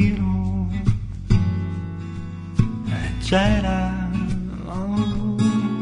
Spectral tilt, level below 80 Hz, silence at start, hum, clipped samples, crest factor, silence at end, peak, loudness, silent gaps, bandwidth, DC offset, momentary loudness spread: -7 dB/octave; -30 dBFS; 0 s; none; under 0.1%; 18 dB; 0 s; -4 dBFS; -23 LUFS; none; 10.5 kHz; under 0.1%; 9 LU